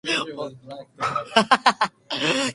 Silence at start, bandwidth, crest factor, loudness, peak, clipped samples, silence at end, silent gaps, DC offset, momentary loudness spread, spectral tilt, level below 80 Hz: 0.05 s; 11.5 kHz; 24 dB; -22 LUFS; 0 dBFS; under 0.1%; 0 s; none; under 0.1%; 16 LU; -3 dB/octave; -66 dBFS